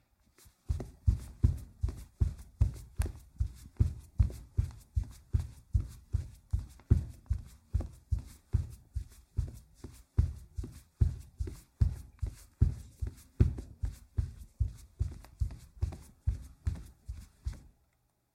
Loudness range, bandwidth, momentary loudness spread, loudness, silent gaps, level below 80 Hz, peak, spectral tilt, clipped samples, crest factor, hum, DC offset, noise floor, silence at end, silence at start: 4 LU; 13.5 kHz; 12 LU; -37 LUFS; none; -38 dBFS; -10 dBFS; -8 dB/octave; under 0.1%; 24 dB; none; under 0.1%; -75 dBFS; 0.75 s; 0.7 s